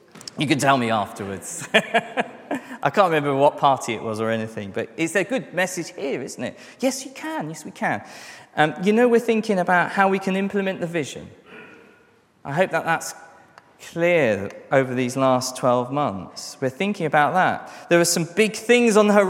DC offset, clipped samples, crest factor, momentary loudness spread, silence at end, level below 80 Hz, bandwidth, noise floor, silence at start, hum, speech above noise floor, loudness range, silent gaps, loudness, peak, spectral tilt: under 0.1%; under 0.1%; 22 dB; 13 LU; 0 s; -70 dBFS; 16.5 kHz; -57 dBFS; 0.15 s; none; 35 dB; 5 LU; none; -21 LUFS; 0 dBFS; -4.5 dB/octave